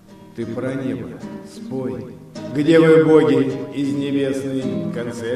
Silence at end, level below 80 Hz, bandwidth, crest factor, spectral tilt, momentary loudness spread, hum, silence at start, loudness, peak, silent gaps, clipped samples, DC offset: 0 s; -58 dBFS; 12 kHz; 18 dB; -7 dB/octave; 22 LU; none; 0.1 s; -18 LUFS; 0 dBFS; none; under 0.1%; under 0.1%